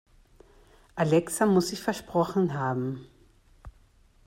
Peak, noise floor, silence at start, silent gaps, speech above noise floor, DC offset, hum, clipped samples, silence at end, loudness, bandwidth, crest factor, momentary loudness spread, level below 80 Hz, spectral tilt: -10 dBFS; -60 dBFS; 0.95 s; none; 34 dB; under 0.1%; none; under 0.1%; 0.55 s; -27 LUFS; 16 kHz; 18 dB; 10 LU; -56 dBFS; -6 dB/octave